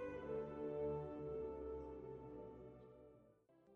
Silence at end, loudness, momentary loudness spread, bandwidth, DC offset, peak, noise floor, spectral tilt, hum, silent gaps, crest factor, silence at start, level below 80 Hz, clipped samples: 0 s; -49 LUFS; 17 LU; 5.6 kHz; under 0.1%; -34 dBFS; -71 dBFS; -8 dB/octave; none; none; 14 dB; 0 s; -66 dBFS; under 0.1%